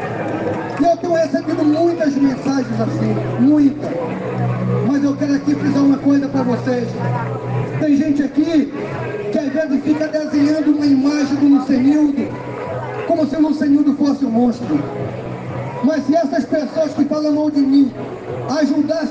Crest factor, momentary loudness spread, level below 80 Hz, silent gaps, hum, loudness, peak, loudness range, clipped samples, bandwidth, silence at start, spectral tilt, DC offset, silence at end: 12 dB; 9 LU; -50 dBFS; none; none; -17 LUFS; -4 dBFS; 2 LU; under 0.1%; 7.6 kHz; 0 s; -7.5 dB/octave; under 0.1%; 0 s